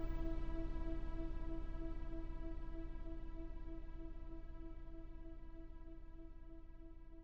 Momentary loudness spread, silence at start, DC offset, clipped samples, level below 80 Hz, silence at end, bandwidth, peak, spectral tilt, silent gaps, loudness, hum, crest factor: 12 LU; 0 s; 0.1%; under 0.1%; -46 dBFS; 0 s; 4.8 kHz; -30 dBFS; -9 dB/octave; none; -52 LUFS; none; 14 dB